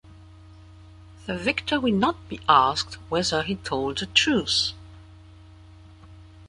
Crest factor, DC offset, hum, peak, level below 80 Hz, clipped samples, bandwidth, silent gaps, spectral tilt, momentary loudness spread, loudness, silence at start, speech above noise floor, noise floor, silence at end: 24 dB; under 0.1%; none; -4 dBFS; -50 dBFS; under 0.1%; 11.5 kHz; none; -3.5 dB/octave; 11 LU; -23 LUFS; 0.05 s; 24 dB; -48 dBFS; 0 s